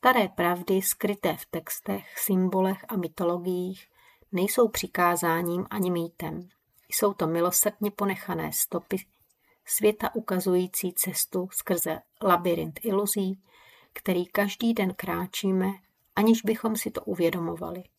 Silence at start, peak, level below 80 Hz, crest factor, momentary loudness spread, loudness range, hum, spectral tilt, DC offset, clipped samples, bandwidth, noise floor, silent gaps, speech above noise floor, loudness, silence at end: 0.05 s; -6 dBFS; -62 dBFS; 22 dB; 10 LU; 2 LU; none; -4.5 dB/octave; under 0.1%; under 0.1%; 16 kHz; -67 dBFS; none; 40 dB; -27 LUFS; 0.15 s